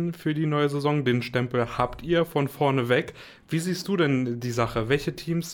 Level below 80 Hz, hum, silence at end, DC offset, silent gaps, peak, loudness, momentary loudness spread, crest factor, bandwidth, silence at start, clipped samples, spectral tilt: -50 dBFS; none; 0 s; under 0.1%; none; -10 dBFS; -26 LUFS; 5 LU; 16 dB; 18.5 kHz; 0 s; under 0.1%; -6 dB/octave